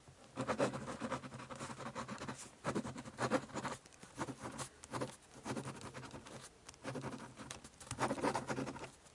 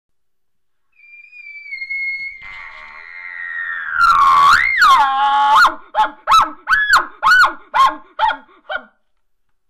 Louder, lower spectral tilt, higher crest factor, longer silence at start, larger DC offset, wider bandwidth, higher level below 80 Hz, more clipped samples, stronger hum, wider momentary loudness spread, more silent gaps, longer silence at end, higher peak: second, -44 LUFS vs -13 LUFS; first, -4.5 dB/octave vs -0.5 dB/octave; first, 24 dB vs 12 dB; second, 0 s vs 1.35 s; neither; second, 11.5 kHz vs 15.5 kHz; second, -70 dBFS vs -46 dBFS; neither; neither; second, 13 LU vs 21 LU; neither; second, 0 s vs 0.9 s; second, -20 dBFS vs -4 dBFS